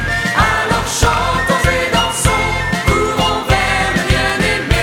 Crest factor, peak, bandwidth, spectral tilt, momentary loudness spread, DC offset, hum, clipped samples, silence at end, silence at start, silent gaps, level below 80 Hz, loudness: 14 dB; 0 dBFS; 18.5 kHz; -4 dB/octave; 2 LU; under 0.1%; none; under 0.1%; 0 s; 0 s; none; -24 dBFS; -14 LUFS